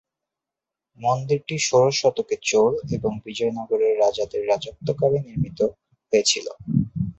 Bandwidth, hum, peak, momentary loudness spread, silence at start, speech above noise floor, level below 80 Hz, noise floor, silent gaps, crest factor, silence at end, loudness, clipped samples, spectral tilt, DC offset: 8.2 kHz; none; -6 dBFS; 7 LU; 1 s; 65 dB; -52 dBFS; -87 dBFS; none; 18 dB; 0.05 s; -22 LUFS; under 0.1%; -4.5 dB/octave; under 0.1%